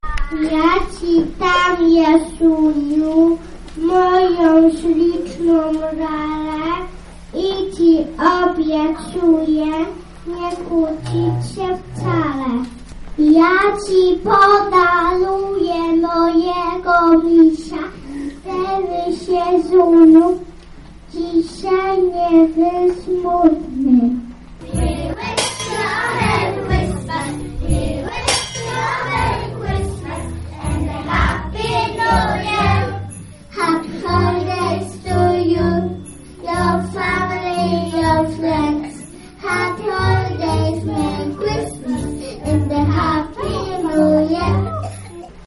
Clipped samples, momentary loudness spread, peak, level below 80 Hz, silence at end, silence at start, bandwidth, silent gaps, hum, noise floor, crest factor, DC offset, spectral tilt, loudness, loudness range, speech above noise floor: under 0.1%; 13 LU; -2 dBFS; -32 dBFS; 0 s; 0.05 s; 11.5 kHz; none; none; -37 dBFS; 14 dB; under 0.1%; -6 dB/octave; -16 LUFS; 6 LU; 23 dB